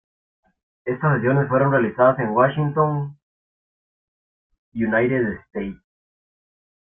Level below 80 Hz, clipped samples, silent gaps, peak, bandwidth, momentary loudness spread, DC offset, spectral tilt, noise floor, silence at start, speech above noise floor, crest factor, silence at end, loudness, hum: -56 dBFS; under 0.1%; 3.23-4.50 s, 4.58-4.72 s; -4 dBFS; 3.6 kHz; 13 LU; under 0.1%; -12 dB/octave; under -90 dBFS; 0.85 s; over 70 dB; 20 dB; 1.2 s; -20 LUFS; none